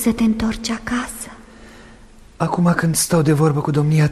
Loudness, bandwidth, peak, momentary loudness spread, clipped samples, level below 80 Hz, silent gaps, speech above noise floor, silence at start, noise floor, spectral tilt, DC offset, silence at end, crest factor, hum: -18 LUFS; 13.5 kHz; -2 dBFS; 9 LU; under 0.1%; -40 dBFS; none; 26 dB; 0 s; -43 dBFS; -5.5 dB/octave; under 0.1%; 0 s; 16 dB; none